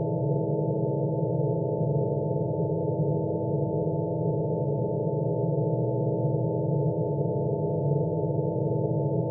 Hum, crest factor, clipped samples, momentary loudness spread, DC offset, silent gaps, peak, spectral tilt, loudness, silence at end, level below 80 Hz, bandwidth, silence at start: none; 12 dB; under 0.1%; 1 LU; under 0.1%; none; -14 dBFS; -6.5 dB/octave; -27 LUFS; 0 s; -58 dBFS; 1 kHz; 0 s